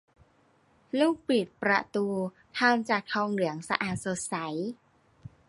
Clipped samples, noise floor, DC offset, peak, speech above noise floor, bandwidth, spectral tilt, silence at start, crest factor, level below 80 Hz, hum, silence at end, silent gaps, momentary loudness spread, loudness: under 0.1%; -65 dBFS; under 0.1%; -4 dBFS; 36 dB; 11.5 kHz; -4.5 dB/octave; 0.95 s; 26 dB; -68 dBFS; none; 0.2 s; none; 9 LU; -29 LUFS